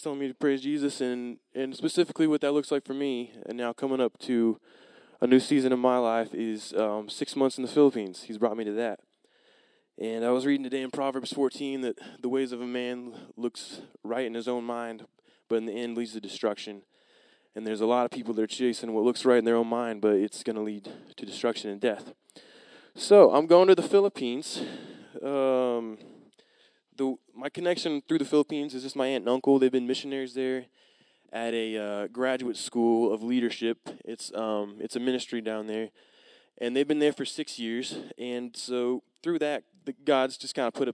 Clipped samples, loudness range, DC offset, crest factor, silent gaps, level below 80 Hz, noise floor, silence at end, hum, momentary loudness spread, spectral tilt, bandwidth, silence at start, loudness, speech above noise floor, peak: under 0.1%; 10 LU; under 0.1%; 24 dB; none; -88 dBFS; -65 dBFS; 0 s; none; 14 LU; -5 dB/octave; 11 kHz; 0 s; -28 LUFS; 38 dB; -4 dBFS